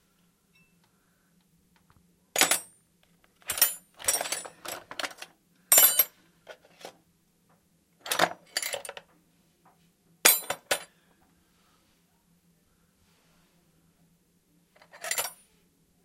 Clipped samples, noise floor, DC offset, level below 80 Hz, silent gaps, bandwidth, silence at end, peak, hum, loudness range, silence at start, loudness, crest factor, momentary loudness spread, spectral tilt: under 0.1%; -68 dBFS; under 0.1%; -74 dBFS; none; 16 kHz; 0.7 s; 0 dBFS; none; 14 LU; 2.35 s; -25 LUFS; 32 dB; 26 LU; 1 dB/octave